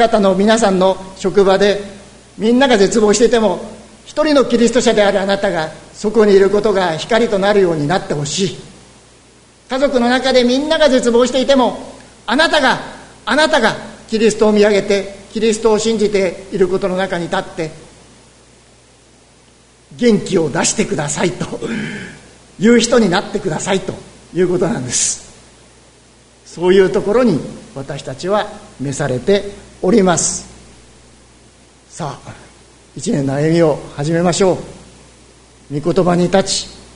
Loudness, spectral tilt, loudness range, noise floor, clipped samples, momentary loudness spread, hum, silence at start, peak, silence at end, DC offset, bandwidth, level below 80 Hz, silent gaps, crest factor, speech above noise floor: -14 LUFS; -4.5 dB/octave; 6 LU; -47 dBFS; under 0.1%; 15 LU; none; 0 s; 0 dBFS; 0.15 s; under 0.1%; 11 kHz; -42 dBFS; none; 16 dB; 34 dB